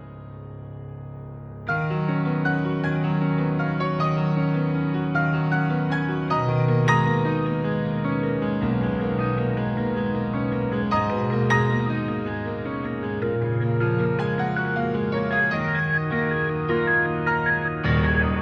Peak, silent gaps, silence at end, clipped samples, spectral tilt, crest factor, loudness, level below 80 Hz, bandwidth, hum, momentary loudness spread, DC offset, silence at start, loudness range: -6 dBFS; none; 0 s; under 0.1%; -8 dB/octave; 18 dB; -23 LUFS; -42 dBFS; 6.2 kHz; none; 8 LU; under 0.1%; 0 s; 3 LU